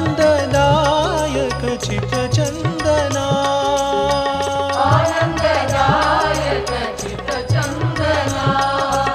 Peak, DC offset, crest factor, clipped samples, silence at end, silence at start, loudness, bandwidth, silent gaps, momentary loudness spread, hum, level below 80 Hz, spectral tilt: -2 dBFS; under 0.1%; 16 dB; under 0.1%; 0 s; 0 s; -17 LUFS; 14.5 kHz; none; 6 LU; none; -34 dBFS; -5 dB/octave